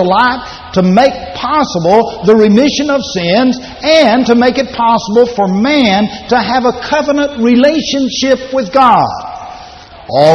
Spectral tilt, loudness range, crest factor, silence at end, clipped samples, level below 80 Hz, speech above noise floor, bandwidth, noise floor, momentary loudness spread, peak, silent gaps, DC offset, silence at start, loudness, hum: -5 dB/octave; 2 LU; 10 dB; 0 s; 0.1%; -40 dBFS; 23 dB; 8.6 kHz; -32 dBFS; 9 LU; 0 dBFS; none; under 0.1%; 0 s; -10 LUFS; none